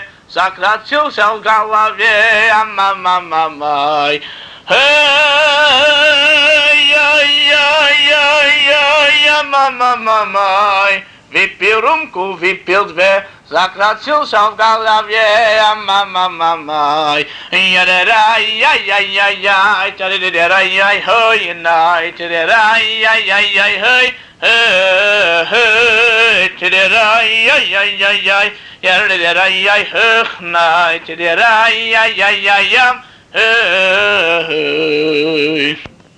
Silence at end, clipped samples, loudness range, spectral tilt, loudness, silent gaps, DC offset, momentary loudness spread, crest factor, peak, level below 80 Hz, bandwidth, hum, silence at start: 0.3 s; under 0.1%; 5 LU; -1.5 dB/octave; -9 LUFS; none; under 0.1%; 8 LU; 10 dB; -2 dBFS; -52 dBFS; 10.5 kHz; none; 0 s